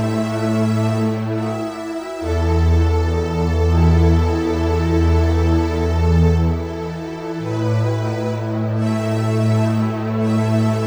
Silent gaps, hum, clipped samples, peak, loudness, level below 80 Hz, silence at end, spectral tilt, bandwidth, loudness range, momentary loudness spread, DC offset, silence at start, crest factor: none; none; under 0.1%; -4 dBFS; -18 LUFS; -24 dBFS; 0 s; -8 dB/octave; 9.8 kHz; 3 LU; 9 LU; under 0.1%; 0 s; 14 dB